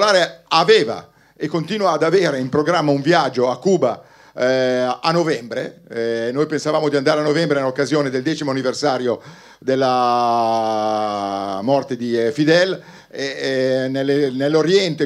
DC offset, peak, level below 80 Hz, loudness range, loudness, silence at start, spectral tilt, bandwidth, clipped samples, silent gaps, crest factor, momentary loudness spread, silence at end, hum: under 0.1%; 0 dBFS; -66 dBFS; 2 LU; -18 LUFS; 0 s; -5 dB/octave; 12.5 kHz; under 0.1%; none; 18 dB; 9 LU; 0 s; none